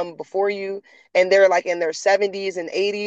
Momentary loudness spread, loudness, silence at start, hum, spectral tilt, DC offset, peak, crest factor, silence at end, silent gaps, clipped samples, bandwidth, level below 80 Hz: 13 LU; -20 LUFS; 0 s; none; -3 dB/octave; under 0.1%; -4 dBFS; 16 dB; 0 s; none; under 0.1%; 8.2 kHz; -78 dBFS